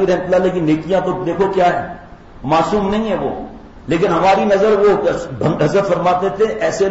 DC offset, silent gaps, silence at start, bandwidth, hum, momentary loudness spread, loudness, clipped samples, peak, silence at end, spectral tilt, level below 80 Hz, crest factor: under 0.1%; none; 0 s; 8 kHz; none; 11 LU; -15 LUFS; under 0.1%; -4 dBFS; 0 s; -6.5 dB/octave; -40 dBFS; 10 dB